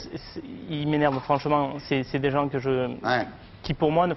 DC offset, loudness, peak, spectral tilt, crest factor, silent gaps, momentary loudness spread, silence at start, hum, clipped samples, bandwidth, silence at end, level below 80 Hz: under 0.1%; -26 LUFS; -8 dBFS; -8 dB/octave; 18 dB; none; 14 LU; 0 s; none; under 0.1%; 6 kHz; 0 s; -50 dBFS